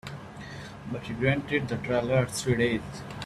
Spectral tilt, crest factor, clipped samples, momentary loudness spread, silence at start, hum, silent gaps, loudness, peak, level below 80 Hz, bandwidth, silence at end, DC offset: -5.5 dB/octave; 20 dB; under 0.1%; 15 LU; 0.05 s; none; none; -28 LUFS; -10 dBFS; -52 dBFS; 13.5 kHz; 0 s; under 0.1%